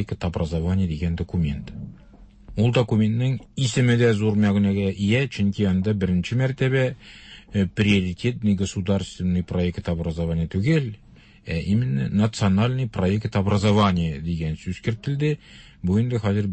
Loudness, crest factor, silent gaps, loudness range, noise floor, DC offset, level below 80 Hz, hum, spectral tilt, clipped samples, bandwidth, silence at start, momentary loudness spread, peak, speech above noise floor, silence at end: -23 LUFS; 14 dB; none; 3 LU; -48 dBFS; under 0.1%; -42 dBFS; none; -7 dB/octave; under 0.1%; 8.6 kHz; 0 s; 9 LU; -8 dBFS; 26 dB; 0 s